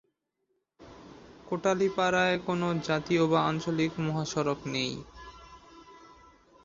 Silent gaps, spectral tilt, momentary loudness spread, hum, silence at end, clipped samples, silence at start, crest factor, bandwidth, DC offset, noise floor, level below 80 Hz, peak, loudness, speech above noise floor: none; -5.5 dB/octave; 21 LU; none; 0.6 s; under 0.1%; 0.8 s; 20 dB; 7.6 kHz; under 0.1%; -79 dBFS; -60 dBFS; -12 dBFS; -29 LUFS; 50 dB